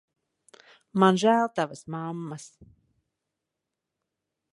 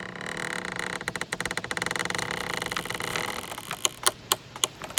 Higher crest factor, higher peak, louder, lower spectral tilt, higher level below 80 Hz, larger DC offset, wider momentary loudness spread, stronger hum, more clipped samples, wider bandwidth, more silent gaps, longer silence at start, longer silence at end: second, 24 dB vs 32 dB; second, -6 dBFS vs 0 dBFS; first, -25 LUFS vs -29 LUFS; first, -6 dB/octave vs -1.5 dB/octave; second, -72 dBFS vs -58 dBFS; neither; first, 17 LU vs 7 LU; neither; neither; second, 11.5 kHz vs 18 kHz; neither; first, 0.95 s vs 0 s; first, 2.05 s vs 0 s